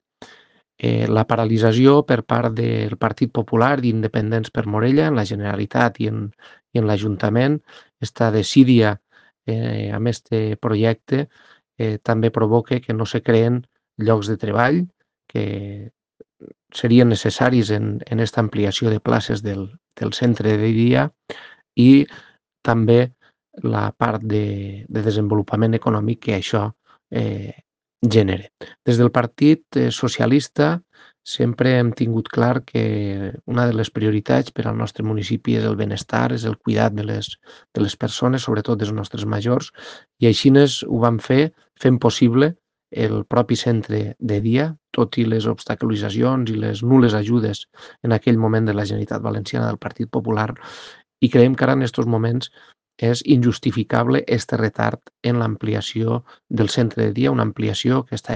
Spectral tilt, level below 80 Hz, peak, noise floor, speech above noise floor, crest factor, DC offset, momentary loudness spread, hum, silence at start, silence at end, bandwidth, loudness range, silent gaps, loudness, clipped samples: -7 dB/octave; -56 dBFS; 0 dBFS; -53 dBFS; 34 dB; 18 dB; under 0.1%; 11 LU; none; 0.2 s; 0 s; 9.2 kHz; 4 LU; none; -19 LUFS; under 0.1%